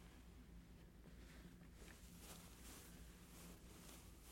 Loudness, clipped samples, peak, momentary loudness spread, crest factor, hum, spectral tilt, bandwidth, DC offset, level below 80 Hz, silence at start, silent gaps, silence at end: -61 LUFS; under 0.1%; -40 dBFS; 5 LU; 22 dB; none; -4 dB/octave; 16.5 kHz; under 0.1%; -64 dBFS; 0 s; none; 0 s